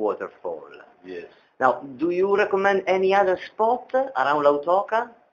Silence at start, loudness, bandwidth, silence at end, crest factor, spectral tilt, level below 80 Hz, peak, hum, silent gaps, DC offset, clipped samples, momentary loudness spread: 0 s; -22 LUFS; 7.2 kHz; 0.25 s; 20 dB; -6 dB/octave; -68 dBFS; -4 dBFS; none; none; under 0.1%; under 0.1%; 16 LU